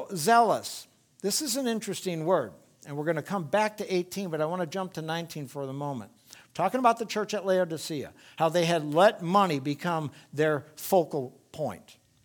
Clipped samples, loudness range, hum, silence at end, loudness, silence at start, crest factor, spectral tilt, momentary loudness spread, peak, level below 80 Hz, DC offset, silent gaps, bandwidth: under 0.1%; 5 LU; none; 0.35 s; -28 LUFS; 0 s; 20 dB; -4.5 dB/octave; 14 LU; -8 dBFS; -74 dBFS; under 0.1%; none; 19.5 kHz